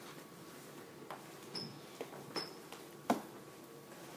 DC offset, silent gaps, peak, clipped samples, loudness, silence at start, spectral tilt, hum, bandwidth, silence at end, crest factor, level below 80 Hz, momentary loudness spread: under 0.1%; none; -18 dBFS; under 0.1%; -46 LUFS; 0 s; -4 dB/octave; none; 19 kHz; 0 s; 28 dB; -86 dBFS; 14 LU